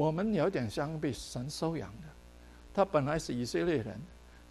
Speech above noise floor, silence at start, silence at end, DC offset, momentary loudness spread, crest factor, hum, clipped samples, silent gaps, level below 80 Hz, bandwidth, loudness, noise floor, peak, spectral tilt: 21 dB; 0 s; 0 s; under 0.1%; 17 LU; 20 dB; 60 Hz at -55 dBFS; under 0.1%; none; -54 dBFS; 13 kHz; -34 LUFS; -54 dBFS; -14 dBFS; -6 dB/octave